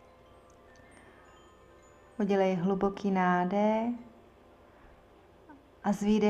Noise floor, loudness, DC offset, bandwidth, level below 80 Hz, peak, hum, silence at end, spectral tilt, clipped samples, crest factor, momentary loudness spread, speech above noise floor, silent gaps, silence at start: -58 dBFS; -30 LUFS; under 0.1%; 9.4 kHz; -62 dBFS; -14 dBFS; none; 0 s; -7 dB/octave; under 0.1%; 18 dB; 9 LU; 30 dB; none; 2.2 s